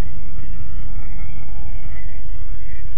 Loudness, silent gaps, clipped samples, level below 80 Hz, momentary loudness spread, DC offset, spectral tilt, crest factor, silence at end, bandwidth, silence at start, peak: -35 LUFS; none; under 0.1%; -30 dBFS; 1 LU; 40%; -7.5 dB/octave; 10 dB; 0 s; 3.6 kHz; 0 s; -6 dBFS